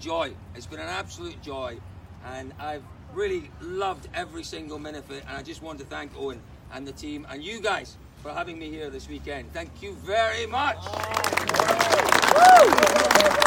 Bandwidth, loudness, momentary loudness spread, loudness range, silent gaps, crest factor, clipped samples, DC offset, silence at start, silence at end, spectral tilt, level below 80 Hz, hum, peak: 17 kHz; -21 LUFS; 21 LU; 16 LU; none; 24 dB; under 0.1%; under 0.1%; 0 s; 0 s; -2.5 dB/octave; -48 dBFS; none; 0 dBFS